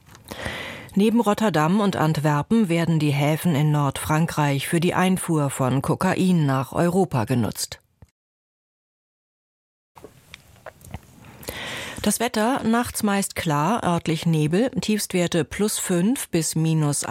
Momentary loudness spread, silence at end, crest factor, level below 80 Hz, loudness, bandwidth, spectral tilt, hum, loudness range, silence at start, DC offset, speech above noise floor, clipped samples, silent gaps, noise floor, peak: 11 LU; 0 s; 16 dB; -52 dBFS; -22 LUFS; 16.5 kHz; -5.5 dB/octave; none; 10 LU; 0.3 s; under 0.1%; 27 dB; under 0.1%; 8.11-9.95 s; -48 dBFS; -6 dBFS